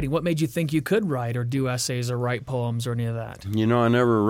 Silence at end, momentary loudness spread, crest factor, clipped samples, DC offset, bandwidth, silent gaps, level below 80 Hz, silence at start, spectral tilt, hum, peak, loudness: 0 s; 8 LU; 14 dB; under 0.1%; under 0.1%; 16.5 kHz; none; -52 dBFS; 0 s; -6 dB/octave; none; -10 dBFS; -25 LUFS